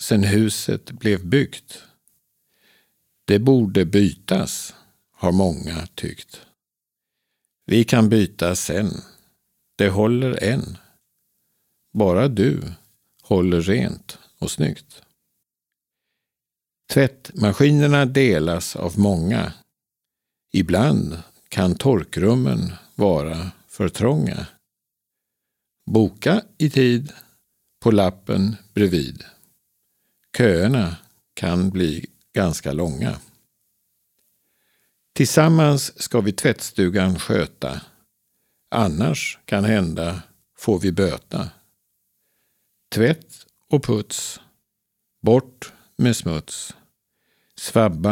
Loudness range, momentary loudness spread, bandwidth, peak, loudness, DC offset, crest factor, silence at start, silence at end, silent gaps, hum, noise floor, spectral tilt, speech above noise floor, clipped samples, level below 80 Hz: 6 LU; 16 LU; 17 kHz; 0 dBFS; -20 LUFS; under 0.1%; 20 dB; 0 s; 0 s; none; none; -87 dBFS; -6 dB/octave; 68 dB; under 0.1%; -46 dBFS